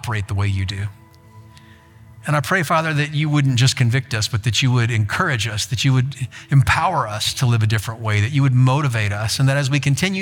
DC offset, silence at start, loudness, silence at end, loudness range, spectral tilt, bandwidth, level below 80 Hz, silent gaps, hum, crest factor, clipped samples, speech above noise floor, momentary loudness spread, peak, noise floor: under 0.1%; 0.05 s; -18 LUFS; 0 s; 3 LU; -5 dB/octave; 17 kHz; -46 dBFS; none; none; 14 dB; under 0.1%; 27 dB; 6 LU; -4 dBFS; -45 dBFS